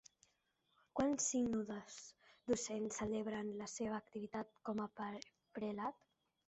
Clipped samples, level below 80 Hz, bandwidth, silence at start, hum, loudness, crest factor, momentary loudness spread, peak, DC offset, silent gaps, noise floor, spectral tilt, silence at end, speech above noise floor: under 0.1%; -74 dBFS; 8.2 kHz; 0.95 s; none; -43 LUFS; 18 dB; 16 LU; -26 dBFS; under 0.1%; none; -82 dBFS; -4 dB/octave; 0.55 s; 39 dB